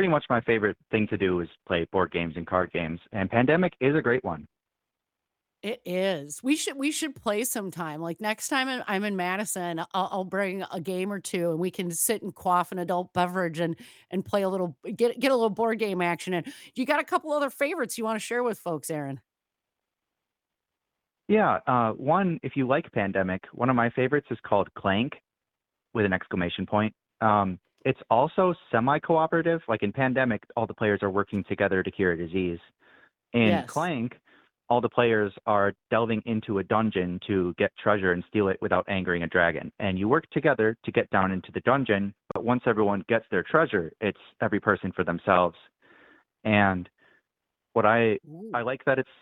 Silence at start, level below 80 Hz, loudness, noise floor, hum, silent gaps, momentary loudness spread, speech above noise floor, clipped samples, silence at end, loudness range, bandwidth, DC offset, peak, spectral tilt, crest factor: 0 s; -64 dBFS; -27 LUFS; -87 dBFS; none; none; 8 LU; 61 dB; under 0.1%; 0.2 s; 4 LU; 18.5 kHz; under 0.1%; -6 dBFS; -5.5 dB/octave; 22 dB